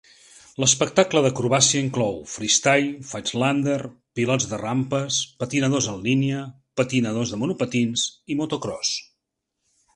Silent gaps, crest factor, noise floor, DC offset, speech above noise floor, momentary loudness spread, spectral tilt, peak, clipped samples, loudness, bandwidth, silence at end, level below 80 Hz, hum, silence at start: none; 20 dB; -80 dBFS; under 0.1%; 57 dB; 10 LU; -3.5 dB/octave; -2 dBFS; under 0.1%; -22 LUFS; 11 kHz; 0.95 s; -58 dBFS; none; 0.6 s